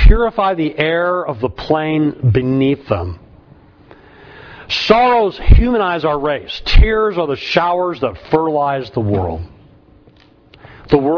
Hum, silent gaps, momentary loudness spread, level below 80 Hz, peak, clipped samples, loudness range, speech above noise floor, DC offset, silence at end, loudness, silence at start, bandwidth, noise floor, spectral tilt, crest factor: none; none; 9 LU; -20 dBFS; 0 dBFS; under 0.1%; 4 LU; 33 dB; under 0.1%; 0 s; -16 LUFS; 0 s; 5.4 kHz; -47 dBFS; -7.5 dB/octave; 14 dB